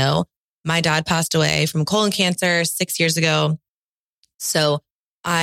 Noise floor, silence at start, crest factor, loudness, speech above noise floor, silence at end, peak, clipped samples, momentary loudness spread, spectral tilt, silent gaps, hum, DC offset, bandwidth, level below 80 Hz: under -90 dBFS; 0 s; 16 dB; -19 LUFS; over 71 dB; 0 s; -4 dBFS; under 0.1%; 10 LU; -4 dB/octave; 0.36-0.62 s, 3.68-4.23 s, 4.35-4.39 s, 4.90-5.24 s; none; under 0.1%; 16.5 kHz; -56 dBFS